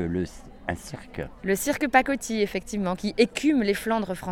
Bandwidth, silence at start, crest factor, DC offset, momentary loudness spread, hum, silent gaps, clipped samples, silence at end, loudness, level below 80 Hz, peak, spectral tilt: 19 kHz; 0 s; 20 dB; under 0.1%; 14 LU; none; none; under 0.1%; 0 s; -26 LUFS; -48 dBFS; -6 dBFS; -4.5 dB/octave